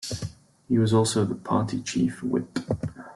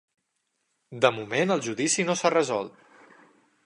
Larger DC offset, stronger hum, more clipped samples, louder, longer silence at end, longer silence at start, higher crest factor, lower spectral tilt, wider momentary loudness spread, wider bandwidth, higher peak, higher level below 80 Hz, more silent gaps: neither; neither; neither; about the same, -26 LUFS vs -25 LUFS; second, 0 s vs 0.95 s; second, 0 s vs 0.9 s; second, 18 dB vs 24 dB; first, -6 dB/octave vs -3.5 dB/octave; first, 11 LU vs 8 LU; first, 12.5 kHz vs 11 kHz; second, -8 dBFS vs -4 dBFS; first, -54 dBFS vs -76 dBFS; neither